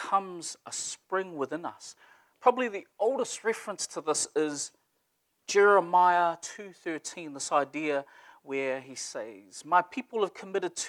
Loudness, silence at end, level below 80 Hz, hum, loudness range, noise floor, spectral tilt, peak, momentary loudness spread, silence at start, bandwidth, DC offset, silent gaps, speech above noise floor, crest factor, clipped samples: -29 LUFS; 0 s; -84 dBFS; none; 5 LU; -76 dBFS; -2.5 dB/octave; -8 dBFS; 16 LU; 0 s; 13.5 kHz; under 0.1%; none; 47 dB; 22 dB; under 0.1%